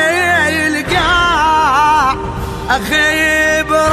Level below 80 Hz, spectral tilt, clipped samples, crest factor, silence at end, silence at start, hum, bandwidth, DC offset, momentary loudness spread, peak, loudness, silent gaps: -30 dBFS; -3.5 dB/octave; under 0.1%; 12 dB; 0 s; 0 s; none; 14 kHz; under 0.1%; 6 LU; 0 dBFS; -12 LUFS; none